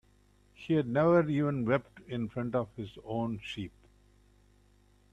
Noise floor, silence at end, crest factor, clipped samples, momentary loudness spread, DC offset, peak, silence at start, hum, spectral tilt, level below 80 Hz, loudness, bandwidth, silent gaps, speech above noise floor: -65 dBFS; 1.45 s; 18 dB; under 0.1%; 16 LU; under 0.1%; -14 dBFS; 0.6 s; 50 Hz at -55 dBFS; -8.5 dB/octave; -62 dBFS; -31 LUFS; 9.8 kHz; none; 34 dB